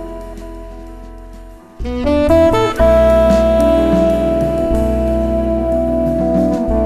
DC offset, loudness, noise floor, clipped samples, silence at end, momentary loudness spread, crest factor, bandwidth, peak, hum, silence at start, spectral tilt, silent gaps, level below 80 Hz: under 0.1%; -14 LUFS; -35 dBFS; under 0.1%; 0 s; 20 LU; 14 dB; 13.5 kHz; 0 dBFS; none; 0 s; -7.5 dB/octave; none; -24 dBFS